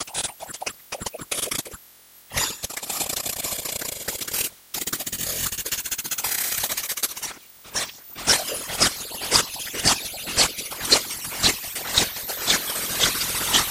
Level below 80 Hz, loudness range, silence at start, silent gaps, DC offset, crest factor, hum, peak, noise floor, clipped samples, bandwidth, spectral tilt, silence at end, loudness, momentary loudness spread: -48 dBFS; 6 LU; 0 s; none; under 0.1%; 26 dB; none; 0 dBFS; -50 dBFS; under 0.1%; 17 kHz; -0.5 dB/octave; 0 s; -23 LUFS; 11 LU